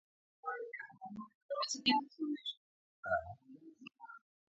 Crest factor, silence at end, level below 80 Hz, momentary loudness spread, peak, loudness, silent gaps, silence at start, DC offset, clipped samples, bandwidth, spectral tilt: 26 dB; 0.3 s; -72 dBFS; 23 LU; -16 dBFS; -39 LUFS; 1.35-1.49 s, 2.57-3.03 s; 0.45 s; under 0.1%; under 0.1%; 7.6 kHz; -1 dB/octave